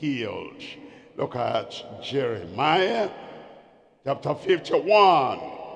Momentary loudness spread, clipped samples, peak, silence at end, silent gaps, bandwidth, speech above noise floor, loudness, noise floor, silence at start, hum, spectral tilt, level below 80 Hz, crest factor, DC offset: 22 LU; under 0.1%; -4 dBFS; 0 s; none; 9.8 kHz; 30 dB; -24 LUFS; -54 dBFS; 0 s; none; -5.5 dB/octave; -68 dBFS; 20 dB; under 0.1%